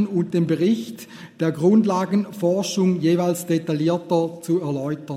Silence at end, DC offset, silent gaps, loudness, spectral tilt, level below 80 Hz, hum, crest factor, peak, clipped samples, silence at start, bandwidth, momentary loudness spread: 0 s; under 0.1%; none; -21 LUFS; -6.5 dB/octave; -66 dBFS; none; 14 dB; -6 dBFS; under 0.1%; 0 s; 16 kHz; 8 LU